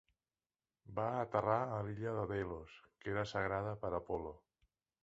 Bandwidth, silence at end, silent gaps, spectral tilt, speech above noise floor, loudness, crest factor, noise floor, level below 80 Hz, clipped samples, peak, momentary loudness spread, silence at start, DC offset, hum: 8 kHz; 0.65 s; none; -5.5 dB/octave; over 50 dB; -40 LUFS; 22 dB; under -90 dBFS; -62 dBFS; under 0.1%; -18 dBFS; 12 LU; 0.85 s; under 0.1%; none